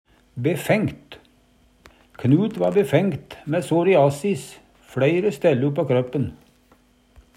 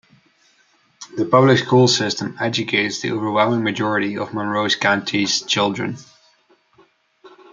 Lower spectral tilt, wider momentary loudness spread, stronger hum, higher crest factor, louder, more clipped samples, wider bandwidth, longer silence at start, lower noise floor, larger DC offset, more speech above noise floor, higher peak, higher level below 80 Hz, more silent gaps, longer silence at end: first, -7 dB/octave vs -4.5 dB/octave; about the same, 13 LU vs 11 LU; neither; about the same, 18 dB vs 18 dB; second, -21 LUFS vs -18 LUFS; neither; first, 16 kHz vs 9.2 kHz; second, 0.35 s vs 1 s; about the same, -58 dBFS vs -59 dBFS; neither; second, 37 dB vs 41 dB; about the same, -4 dBFS vs -2 dBFS; first, -56 dBFS vs -64 dBFS; neither; first, 1.05 s vs 0.25 s